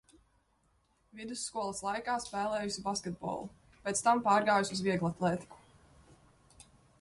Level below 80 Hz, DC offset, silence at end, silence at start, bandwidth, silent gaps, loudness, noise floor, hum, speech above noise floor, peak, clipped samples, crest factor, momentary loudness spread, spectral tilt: -66 dBFS; under 0.1%; 1.45 s; 1.15 s; 11.5 kHz; none; -33 LUFS; -73 dBFS; none; 40 dB; -16 dBFS; under 0.1%; 20 dB; 14 LU; -4 dB/octave